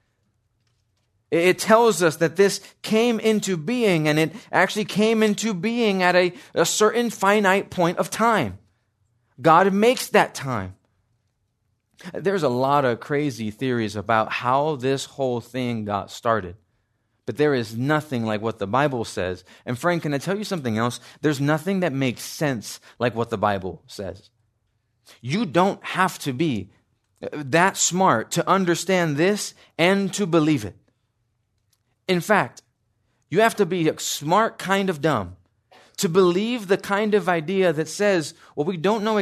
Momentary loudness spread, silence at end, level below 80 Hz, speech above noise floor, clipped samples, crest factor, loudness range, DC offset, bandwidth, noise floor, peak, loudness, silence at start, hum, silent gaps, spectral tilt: 10 LU; 0 s; -66 dBFS; 50 dB; under 0.1%; 20 dB; 5 LU; under 0.1%; 14 kHz; -71 dBFS; -2 dBFS; -22 LUFS; 1.3 s; none; none; -4.5 dB/octave